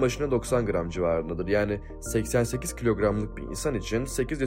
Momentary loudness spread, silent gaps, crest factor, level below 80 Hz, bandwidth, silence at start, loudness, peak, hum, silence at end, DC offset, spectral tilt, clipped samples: 5 LU; none; 16 dB; -40 dBFS; 16 kHz; 0 s; -28 LUFS; -10 dBFS; none; 0 s; under 0.1%; -5.5 dB/octave; under 0.1%